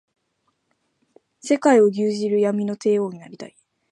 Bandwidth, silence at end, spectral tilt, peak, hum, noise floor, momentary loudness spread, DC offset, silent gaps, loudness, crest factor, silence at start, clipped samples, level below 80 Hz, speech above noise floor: 11 kHz; 0.45 s; -6 dB/octave; -4 dBFS; none; -71 dBFS; 23 LU; under 0.1%; none; -20 LUFS; 18 dB; 1.45 s; under 0.1%; -76 dBFS; 52 dB